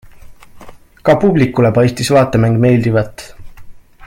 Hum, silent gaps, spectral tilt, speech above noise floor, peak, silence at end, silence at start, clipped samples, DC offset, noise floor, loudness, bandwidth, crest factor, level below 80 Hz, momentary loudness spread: none; none; -7 dB/octave; 24 dB; 0 dBFS; 0 s; 0.15 s; under 0.1%; under 0.1%; -36 dBFS; -12 LUFS; 15.5 kHz; 14 dB; -40 dBFS; 7 LU